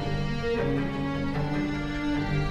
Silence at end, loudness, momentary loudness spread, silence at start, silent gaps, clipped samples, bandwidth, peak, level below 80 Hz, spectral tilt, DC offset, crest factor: 0 s; -29 LUFS; 3 LU; 0 s; none; under 0.1%; 10 kHz; -14 dBFS; -38 dBFS; -7 dB/octave; under 0.1%; 12 dB